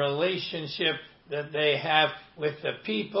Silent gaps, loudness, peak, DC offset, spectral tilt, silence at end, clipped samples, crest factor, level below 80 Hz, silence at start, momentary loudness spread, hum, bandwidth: none; -28 LUFS; -8 dBFS; under 0.1%; -8.5 dB/octave; 0 s; under 0.1%; 20 dB; -70 dBFS; 0 s; 11 LU; none; 5.8 kHz